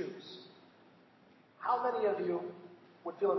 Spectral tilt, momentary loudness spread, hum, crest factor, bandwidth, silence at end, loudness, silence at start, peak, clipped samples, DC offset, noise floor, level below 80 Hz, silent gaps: -4 dB/octave; 21 LU; none; 18 dB; 6 kHz; 0 s; -36 LUFS; 0 s; -20 dBFS; under 0.1%; under 0.1%; -63 dBFS; under -90 dBFS; none